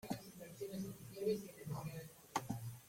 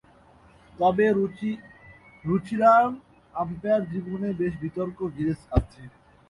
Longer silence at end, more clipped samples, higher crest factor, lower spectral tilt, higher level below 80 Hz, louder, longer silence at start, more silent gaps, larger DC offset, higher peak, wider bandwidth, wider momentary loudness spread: second, 0 s vs 0.4 s; neither; about the same, 22 dB vs 20 dB; second, -5.5 dB/octave vs -8.5 dB/octave; second, -72 dBFS vs -42 dBFS; second, -46 LUFS vs -25 LUFS; second, 0.05 s vs 0.8 s; neither; neither; second, -24 dBFS vs -6 dBFS; first, 16.5 kHz vs 11 kHz; second, 9 LU vs 14 LU